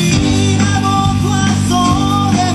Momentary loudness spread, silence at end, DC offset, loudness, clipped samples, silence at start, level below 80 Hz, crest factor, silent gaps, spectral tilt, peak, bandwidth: 1 LU; 0 s; under 0.1%; -13 LUFS; under 0.1%; 0 s; -30 dBFS; 12 dB; none; -5 dB/octave; 0 dBFS; 13 kHz